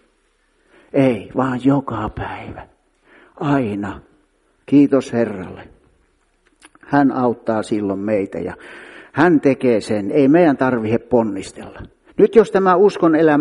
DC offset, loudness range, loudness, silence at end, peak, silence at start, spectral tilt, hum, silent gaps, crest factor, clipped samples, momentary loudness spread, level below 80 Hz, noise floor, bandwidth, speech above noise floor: under 0.1%; 6 LU; -17 LUFS; 0 s; 0 dBFS; 0.95 s; -7.5 dB/octave; none; none; 18 dB; under 0.1%; 18 LU; -48 dBFS; -61 dBFS; 11 kHz; 45 dB